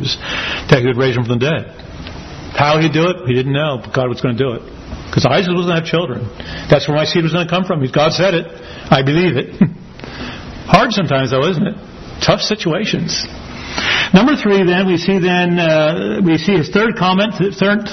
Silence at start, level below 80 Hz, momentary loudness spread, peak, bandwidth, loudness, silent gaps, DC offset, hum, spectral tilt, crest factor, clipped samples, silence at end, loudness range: 0 s; -40 dBFS; 16 LU; 0 dBFS; 6.4 kHz; -14 LUFS; none; under 0.1%; none; -6 dB/octave; 14 dB; under 0.1%; 0 s; 3 LU